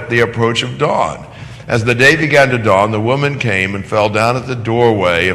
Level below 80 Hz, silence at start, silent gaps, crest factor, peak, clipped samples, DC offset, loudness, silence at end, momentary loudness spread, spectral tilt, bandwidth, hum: -40 dBFS; 0 s; none; 14 dB; 0 dBFS; 0.2%; under 0.1%; -13 LUFS; 0 s; 9 LU; -5.5 dB/octave; 13 kHz; none